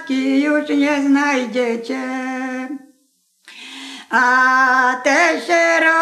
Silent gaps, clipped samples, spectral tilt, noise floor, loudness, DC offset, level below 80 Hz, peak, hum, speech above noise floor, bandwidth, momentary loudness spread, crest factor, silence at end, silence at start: none; under 0.1%; -2.5 dB/octave; -62 dBFS; -16 LUFS; under 0.1%; -82 dBFS; -2 dBFS; none; 46 dB; 12.5 kHz; 19 LU; 14 dB; 0 s; 0 s